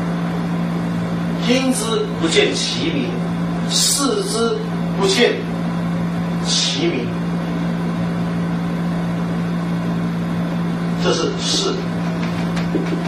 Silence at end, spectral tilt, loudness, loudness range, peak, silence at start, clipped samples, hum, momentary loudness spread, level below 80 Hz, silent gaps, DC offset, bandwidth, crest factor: 0 s; -4.5 dB/octave; -19 LUFS; 4 LU; -2 dBFS; 0 s; under 0.1%; none; 6 LU; -44 dBFS; none; under 0.1%; 14.5 kHz; 18 dB